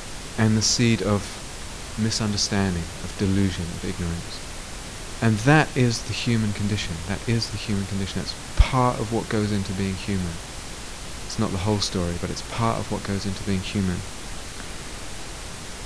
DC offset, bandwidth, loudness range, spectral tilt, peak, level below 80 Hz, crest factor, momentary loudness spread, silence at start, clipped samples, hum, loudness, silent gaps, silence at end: under 0.1%; 11 kHz; 4 LU; -4.5 dB/octave; -2 dBFS; -36 dBFS; 22 dB; 15 LU; 0 s; under 0.1%; none; -25 LUFS; none; 0 s